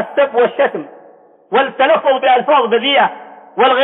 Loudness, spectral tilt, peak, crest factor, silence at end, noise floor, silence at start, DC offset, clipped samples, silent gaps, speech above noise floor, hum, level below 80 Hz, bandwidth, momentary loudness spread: -13 LUFS; -7.5 dB/octave; -2 dBFS; 12 dB; 0 s; -44 dBFS; 0 s; under 0.1%; under 0.1%; none; 31 dB; none; -70 dBFS; 4.1 kHz; 6 LU